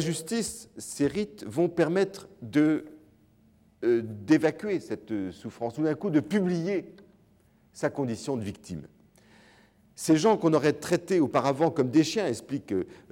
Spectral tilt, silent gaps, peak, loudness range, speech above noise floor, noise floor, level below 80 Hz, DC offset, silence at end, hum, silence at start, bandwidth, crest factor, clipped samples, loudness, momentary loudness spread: -5.5 dB/octave; none; -10 dBFS; 7 LU; 35 dB; -62 dBFS; -66 dBFS; under 0.1%; 0.15 s; none; 0 s; 16.5 kHz; 18 dB; under 0.1%; -27 LUFS; 11 LU